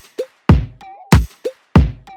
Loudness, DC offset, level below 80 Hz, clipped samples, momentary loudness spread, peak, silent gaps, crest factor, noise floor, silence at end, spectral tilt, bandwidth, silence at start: -16 LUFS; under 0.1%; -22 dBFS; under 0.1%; 14 LU; 0 dBFS; none; 16 dB; -33 dBFS; 0.25 s; -7 dB/octave; 17.5 kHz; 0.2 s